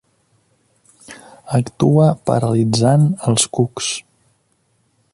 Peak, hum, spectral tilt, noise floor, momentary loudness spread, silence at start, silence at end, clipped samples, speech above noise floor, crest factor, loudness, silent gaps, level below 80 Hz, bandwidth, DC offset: -2 dBFS; none; -5.5 dB/octave; -63 dBFS; 10 LU; 1.1 s; 1.15 s; under 0.1%; 48 dB; 16 dB; -16 LUFS; none; -52 dBFS; 11.5 kHz; under 0.1%